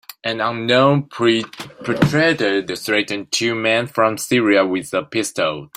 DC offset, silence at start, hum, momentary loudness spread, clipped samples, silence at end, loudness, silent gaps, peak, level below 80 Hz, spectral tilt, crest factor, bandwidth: under 0.1%; 0.25 s; none; 7 LU; under 0.1%; 0.1 s; -18 LUFS; none; -2 dBFS; -54 dBFS; -4.5 dB/octave; 16 dB; 16 kHz